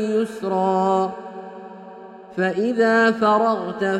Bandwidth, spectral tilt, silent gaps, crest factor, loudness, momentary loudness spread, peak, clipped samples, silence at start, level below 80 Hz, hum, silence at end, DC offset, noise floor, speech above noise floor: 11.5 kHz; -6 dB/octave; none; 16 dB; -20 LUFS; 22 LU; -6 dBFS; under 0.1%; 0 s; -66 dBFS; none; 0 s; under 0.1%; -40 dBFS; 21 dB